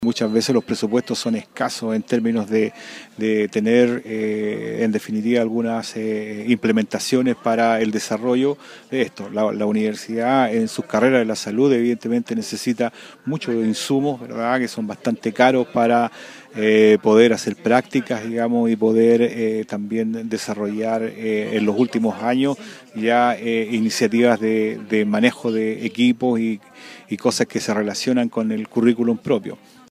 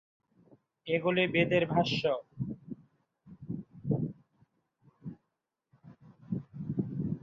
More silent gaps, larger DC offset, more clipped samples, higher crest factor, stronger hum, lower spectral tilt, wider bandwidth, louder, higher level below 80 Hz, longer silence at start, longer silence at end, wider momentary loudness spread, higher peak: neither; neither; neither; about the same, 18 dB vs 22 dB; neither; second, -5 dB/octave vs -7 dB/octave; first, 15 kHz vs 7.4 kHz; first, -20 LUFS vs -32 LUFS; about the same, -66 dBFS vs -64 dBFS; second, 0 s vs 0.85 s; first, 0.35 s vs 0.05 s; second, 9 LU vs 21 LU; first, 0 dBFS vs -12 dBFS